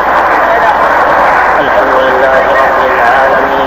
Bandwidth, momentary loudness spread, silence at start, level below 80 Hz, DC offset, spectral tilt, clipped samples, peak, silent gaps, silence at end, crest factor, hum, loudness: 16.5 kHz; 1 LU; 0 s; -34 dBFS; under 0.1%; -4.5 dB/octave; 2%; 0 dBFS; none; 0 s; 8 dB; none; -7 LUFS